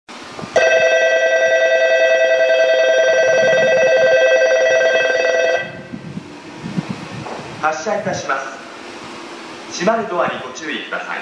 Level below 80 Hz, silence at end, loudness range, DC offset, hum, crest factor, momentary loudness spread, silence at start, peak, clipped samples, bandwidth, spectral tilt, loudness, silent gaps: -60 dBFS; 0 s; 11 LU; under 0.1%; none; 12 dB; 19 LU; 0.1 s; -4 dBFS; under 0.1%; 10 kHz; -3 dB/octave; -15 LUFS; none